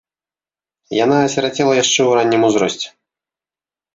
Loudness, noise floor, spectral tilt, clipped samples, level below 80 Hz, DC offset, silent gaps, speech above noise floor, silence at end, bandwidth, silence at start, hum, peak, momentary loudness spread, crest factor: -15 LUFS; under -90 dBFS; -3.5 dB/octave; under 0.1%; -60 dBFS; under 0.1%; none; over 75 dB; 1.05 s; 8 kHz; 0.9 s; none; -2 dBFS; 9 LU; 16 dB